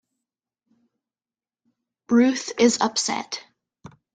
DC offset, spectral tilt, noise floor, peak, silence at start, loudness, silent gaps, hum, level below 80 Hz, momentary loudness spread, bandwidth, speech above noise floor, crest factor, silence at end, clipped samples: under 0.1%; -3 dB/octave; under -90 dBFS; -4 dBFS; 2.1 s; -21 LUFS; none; none; -68 dBFS; 12 LU; 9.4 kHz; over 69 dB; 22 dB; 0.75 s; under 0.1%